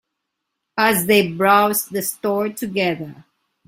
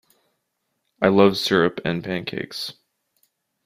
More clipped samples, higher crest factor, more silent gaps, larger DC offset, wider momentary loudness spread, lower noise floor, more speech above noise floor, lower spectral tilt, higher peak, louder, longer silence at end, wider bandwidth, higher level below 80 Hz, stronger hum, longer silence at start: neither; about the same, 18 dB vs 22 dB; neither; neither; about the same, 12 LU vs 14 LU; about the same, -78 dBFS vs -75 dBFS; first, 60 dB vs 55 dB; second, -3.5 dB/octave vs -5.5 dB/octave; about the same, -2 dBFS vs -2 dBFS; first, -18 LUFS vs -21 LUFS; second, 0.45 s vs 0.95 s; about the same, 16.5 kHz vs 15.5 kHz; about the same, -60 dBFS vs -58 dBFS; neither; second, 0.75 s vs 1 s